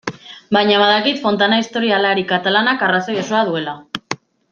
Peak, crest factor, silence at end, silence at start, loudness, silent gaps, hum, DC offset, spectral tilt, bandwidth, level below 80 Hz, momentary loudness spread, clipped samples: 0 dBFS; 16 dB; 0.35 s; 0.05 s; -16 LUFS; none; none; under 0.1%; -4.5 dB/octave; 7.4 kHz; -62 dBFS; 14 LU; under 0.1%